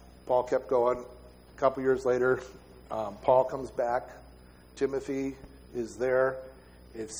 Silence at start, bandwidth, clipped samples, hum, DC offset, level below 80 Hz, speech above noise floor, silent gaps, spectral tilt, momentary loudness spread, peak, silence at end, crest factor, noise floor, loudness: 0.05 s; over 20 kHz; under 0.1%; none; under 0.1%; -56 dBFS; 25 dB; none; -6 dB/octave; 17 LU; -10 dBFS; 0 s; 20 dB; -53 dBFS; -29 LUFS